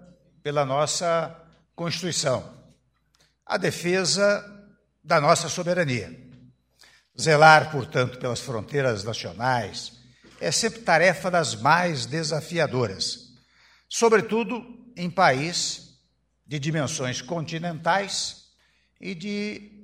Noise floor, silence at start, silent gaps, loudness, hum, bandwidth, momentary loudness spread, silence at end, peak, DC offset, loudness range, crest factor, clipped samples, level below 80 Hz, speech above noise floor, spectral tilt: -69 dBFS; 0.45 s; none; -24 LUFS; none; 16 kHz; 14 LU; 0.15 s; 0 dBFS; under 0.1%; 6 LU; 24 dB; under 0.1%; -62 dBFS; 45 dB; -3.5 dB/octave